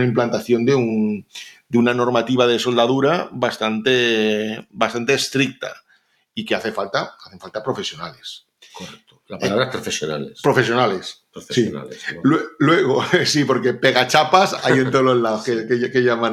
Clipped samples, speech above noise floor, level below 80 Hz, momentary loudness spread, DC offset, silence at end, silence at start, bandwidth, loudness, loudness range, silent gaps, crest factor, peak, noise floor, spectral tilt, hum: under 0.1%; 41 dB; -62 dBFS; 16 LU; under 0.1%; 0 s; 0 s; 14.5 kHz; -18 LUFS; 10 LU; none; 20 dB; 0 dBFS; -60 dBFS; -4.5 dB/octave; none